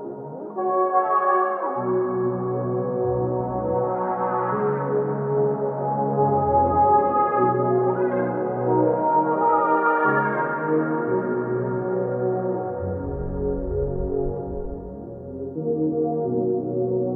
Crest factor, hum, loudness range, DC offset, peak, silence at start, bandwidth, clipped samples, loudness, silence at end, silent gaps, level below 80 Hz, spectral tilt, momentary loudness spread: 16 dB; none; 6 LU; under 0.1%; -6 dBFS; 0 s; 3 kHz; under 0.1%; -23 LUFS; 0 s; none; -42 dBFS; -12.5 dB/octave; 9 LU